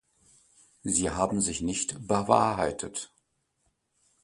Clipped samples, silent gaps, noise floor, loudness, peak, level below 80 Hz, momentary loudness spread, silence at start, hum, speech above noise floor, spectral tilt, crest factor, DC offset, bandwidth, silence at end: under 0.1%; none; -75 dBFS; -28 LUFS; -6 dBFS; -52 dBFS; 14 LU; 0.85 s; none; 48 dB; -4 dB/octave; 26 dB; under 0.1%; 11.5 kHz; 1.2 s